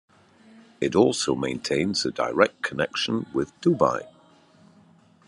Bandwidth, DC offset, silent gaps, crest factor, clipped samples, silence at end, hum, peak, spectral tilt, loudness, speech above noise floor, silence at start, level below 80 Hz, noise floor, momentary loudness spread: 11.5 kHz; under 0.1%; none; 24 dB; under 0.1%; 1.2 s; none; -2 dBFS; -4.5 dB/octave; -24 LUFS; 32 dB; 0.8 s; -60 dBFS; -56 dBFS; 7 LU